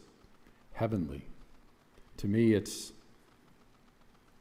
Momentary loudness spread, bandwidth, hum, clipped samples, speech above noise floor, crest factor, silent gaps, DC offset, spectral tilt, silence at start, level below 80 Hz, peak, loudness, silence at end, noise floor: 21 LU; 16 kHz; none; under 0.1%; 31 dB; 20 dB; none; under 0.1%; -6.5 dB/octave; 0.7 s; -58 dBFS; -16 dBFS; -32 LUFS; 1.4 s; -62 dBFS